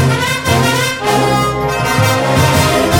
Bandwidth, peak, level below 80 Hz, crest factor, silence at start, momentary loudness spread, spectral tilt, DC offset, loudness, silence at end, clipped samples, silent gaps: 18.5 kHz; 0 dBFS; -32 dBFS; 12 dB; 0 s; 3 LU; -4.5 dB/octave; 0.3%; -12 LUFS; 0 s; under 0.1%; none